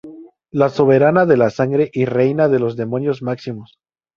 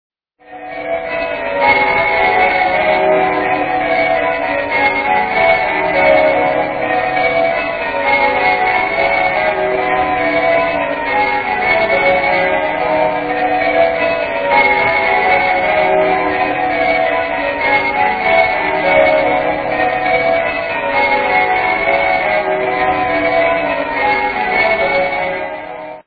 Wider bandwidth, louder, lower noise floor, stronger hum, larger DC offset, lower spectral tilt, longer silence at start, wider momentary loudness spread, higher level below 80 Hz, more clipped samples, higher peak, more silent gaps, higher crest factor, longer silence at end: first, 7 kHz vs 4.9 kHz; second, -16 LUFS vs -13 LUFS; about the same, -38 dBFS vs -37 dBFS; neither; neither; first, -8.5 dB/octave vs -7 dB/octave; second, 0.05 s vs 0.5 s; first, 13 LU vs 5 LU; second, -56 dBFS vs -42 dBFS; neither; about the same, 0 dBFS vs 0 dBFS; neither; about the same, 16 dB vs 14 dB; first, 0.5 s vs 0.05 s